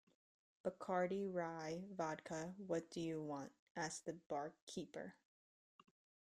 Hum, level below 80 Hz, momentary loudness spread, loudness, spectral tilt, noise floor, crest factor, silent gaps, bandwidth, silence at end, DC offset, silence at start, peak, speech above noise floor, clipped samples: none; -82 dBFS; 9 LU; -47 LUFS; -5 dB/octave; under -90 dBFS; 20 dB; 3.59-3.75 s, 4.26-4.30 s, 4.62-4.67 s; 14 kHz; 1.2 s; under 0.1%; 0.65 s; -28 dBFS; over 44 dB; under 0.1%